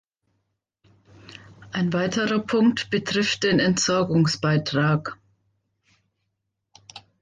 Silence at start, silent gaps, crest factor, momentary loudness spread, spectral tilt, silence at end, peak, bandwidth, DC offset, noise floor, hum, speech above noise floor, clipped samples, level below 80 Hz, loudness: 1.25 s; none; 16 dB; 8 LU; -5 dB/octave; 0.2 s; -10 dBFS; 9.6 kHz; under 0.1%; -78 dBFS; none; 57 dB; under 0.1%; -58 dBFS; -22 LUFS